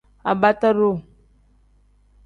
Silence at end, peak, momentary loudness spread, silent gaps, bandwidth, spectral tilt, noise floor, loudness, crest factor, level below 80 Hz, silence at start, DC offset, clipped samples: 1.25 s; -2 dBFS; 8 LU; none; 7.2 kHz; -8 dB/octave; -57 dBFS; -19 LUFS; 20 dB; -54 dBFS; 0.25 s; under 0.1%; under 0.1%